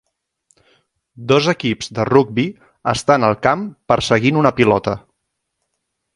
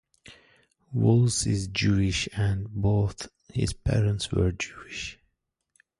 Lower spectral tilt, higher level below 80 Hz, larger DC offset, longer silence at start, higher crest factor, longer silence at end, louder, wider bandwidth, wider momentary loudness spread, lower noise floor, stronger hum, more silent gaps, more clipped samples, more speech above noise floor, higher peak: about the same, -5.5 dB/octave vs -5.5 dB/octave; second, -48 dBFS vs -42 dBFS; neither; first, 1.2 s vs 0.3 s; about the same, 18 dB vs 18 dB; first, 1.15 s vs 0.85 s; first, -16 LUFS vs -26 LUFS; about the same, 11.5 kHz vs 11.5 kHz; second, 10 LU vs 13 LU; second, -74 dBFS vs -78 dBFS; neither; neither; neither; first, 59 dB vs 53 dB; first, 0 dBFS vs -10 dBFS